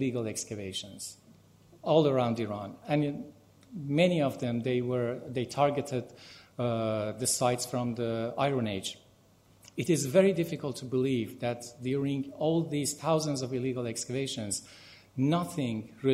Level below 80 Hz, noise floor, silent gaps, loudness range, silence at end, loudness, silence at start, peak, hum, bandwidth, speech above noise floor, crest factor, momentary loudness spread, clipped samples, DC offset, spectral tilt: -68 dBFS; -62 dBFS; none; 2 LU; 0 s; -31 LUFS; 0 s; -10 dBFS; none; 16 kHz; 31 dB; 20 dB; 14 LU; under 0.1%; under 0.1%; -5 dB/octave